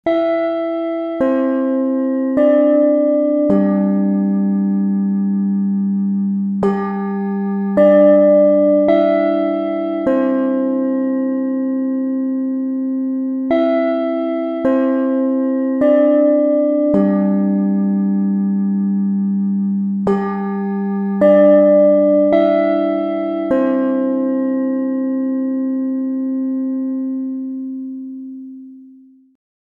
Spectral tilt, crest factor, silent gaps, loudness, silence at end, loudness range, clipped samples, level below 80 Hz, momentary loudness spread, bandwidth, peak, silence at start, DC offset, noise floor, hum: -10.5 dB/octave; 14 dB; none; -16 LUFS; 0.8 s; 6 LU; under 0.1%; -58 dBFS; 9 LU; 4.9 kHz; 0 dBFS; 0.05 s; under 0.1%; -44 dBFS; none